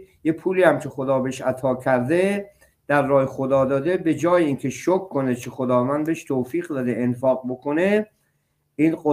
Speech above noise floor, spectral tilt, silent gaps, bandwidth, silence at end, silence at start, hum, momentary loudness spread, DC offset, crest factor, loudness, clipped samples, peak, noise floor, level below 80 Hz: 48 dB; -7 dB/octave; none; 15.5 kHz; 0 s; 0 s; none; 7 LU; under 0.1%; 18 dB; -22 LUFS; under 0.1%; -2 dBFS; -69 dBFS; -60 dBFS